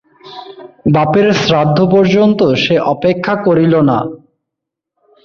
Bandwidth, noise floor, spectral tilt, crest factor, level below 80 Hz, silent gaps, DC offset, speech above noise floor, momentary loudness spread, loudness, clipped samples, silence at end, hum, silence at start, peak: 7.2 kHz; -79 dBFS; -7 dB/octave; 12 dB; -48 dBFS; none; under 0.1%; 69 dB; 11 LU; -11 LUFS; under 0.1%; 1.1 s; none; 0.25 s; 0 dBFS